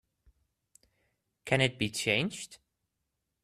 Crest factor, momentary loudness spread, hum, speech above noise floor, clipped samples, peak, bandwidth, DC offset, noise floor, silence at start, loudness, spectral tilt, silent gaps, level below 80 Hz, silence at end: 26 dB; 18 LU; none; 53 dB; under 0.1%; -10 dBFS; 14.5 kHz; under 0.1%; -84 dBFS; 1.45 s; -30 LUFS; -4 dB/octave; none; -64 dBFS; 0.9 s